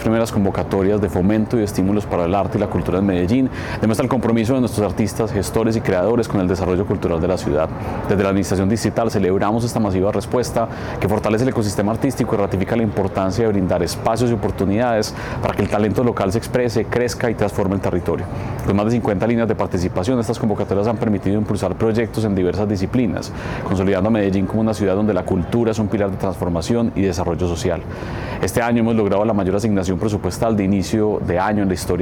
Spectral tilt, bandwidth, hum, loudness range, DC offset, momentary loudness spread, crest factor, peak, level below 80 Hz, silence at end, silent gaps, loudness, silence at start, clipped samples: -7 dB/octave; 18 kHz; none; 1 LU; under 0.1%; 4 LU; 12 dB; -6 dBFS; -38 dBFS; 0 s; none; -19 LUFS; 0 s; under 0.1%